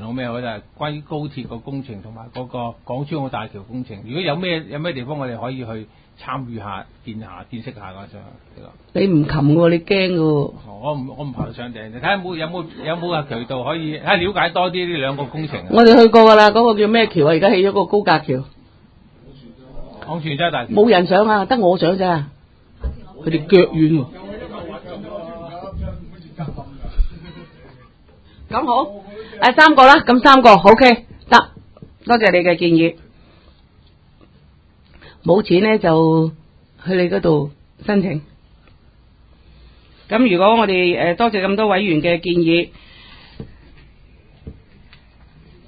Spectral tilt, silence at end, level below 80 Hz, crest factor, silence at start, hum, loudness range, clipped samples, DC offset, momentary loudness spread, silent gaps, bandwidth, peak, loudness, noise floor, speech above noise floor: -7 dB/octave; 1.15 s; -38 dBFS; 16 dB; 0 s; none; 16 LU; 0.2%; under 0.1%; 22 LU; none; 8 kHz; 0 dBFS; -15 LUFS; -50 dBFS; 35 dB